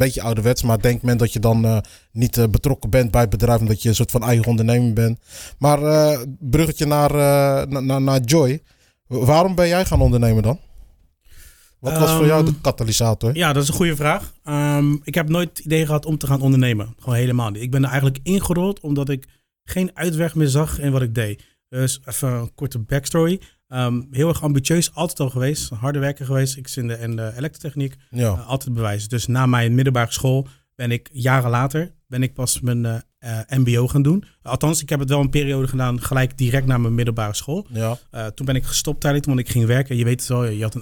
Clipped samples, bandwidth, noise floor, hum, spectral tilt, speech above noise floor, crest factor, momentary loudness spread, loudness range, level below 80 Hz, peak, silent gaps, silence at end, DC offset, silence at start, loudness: under 0.1%; 19.5 kHz; -50 dBFS; none; -6 dB/octave; 31 dB; 18 dB; 10 LU; 4 LU; -36 dBFS; 0 dBFS; none; 0 s; under 0.1%; 0 s; -19 LUFS